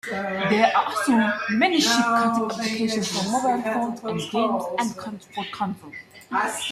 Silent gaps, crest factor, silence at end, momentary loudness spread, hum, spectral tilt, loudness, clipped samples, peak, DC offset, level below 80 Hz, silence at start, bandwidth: none; 20 dB; 0 s; 13 LU; none; -3.5 dB/octave; -23 LUFS; under 0.1%; -4 dBFS; under 0.1%; -66 dBFS; 0.05 s; 14.5 kHz